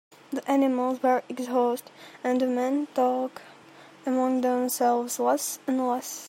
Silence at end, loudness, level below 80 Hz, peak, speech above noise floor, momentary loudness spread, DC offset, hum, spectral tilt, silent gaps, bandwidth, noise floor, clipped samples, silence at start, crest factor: 0 s; -26 LUFS; -82 dBFS; -10 dBFS; 25 dB; 10 LU; under 0.1%; none; -3 dB/octave; none; 16 kHz; -51 dBFS; under 0.1%; 0.3 s; 16 dB